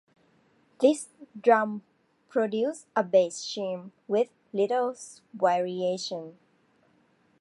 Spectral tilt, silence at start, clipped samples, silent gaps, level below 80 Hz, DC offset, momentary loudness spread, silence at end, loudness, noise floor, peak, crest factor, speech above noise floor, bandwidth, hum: -4.5 dB/octave; 0.8 s; under 0.1%; none; -84 dBFS; under 0.1%; 15 LU; 1.1 s; -27 LUFS; -66 dBFS; -6 dBFS; 22 dB; 39 dB; 11.5 kHz; none